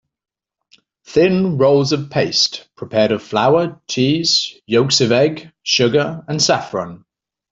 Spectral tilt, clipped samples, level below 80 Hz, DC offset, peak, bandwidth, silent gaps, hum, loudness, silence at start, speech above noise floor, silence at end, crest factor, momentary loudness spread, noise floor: -4 dB/octave; under 0.1%; -56 dBFS; under 0.1%; -2 dBFS; 8.2 kHz; none; none; -16 LUFS; 1.1 s; 40 dB; 0.55 s; 16 dB; 8 LU; -56 dBFS